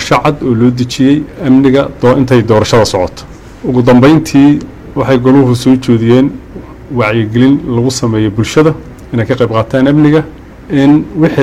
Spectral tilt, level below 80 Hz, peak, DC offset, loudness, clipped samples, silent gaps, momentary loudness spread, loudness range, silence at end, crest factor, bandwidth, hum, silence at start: -6.5 dB/octave; -34 dBFS; 0 dBFS; under 0.1%; -9 LUFS; under 0.1%; none; 10 LU; 3 LU; 0 s; 8 dB; 14 kHz; none; 0 s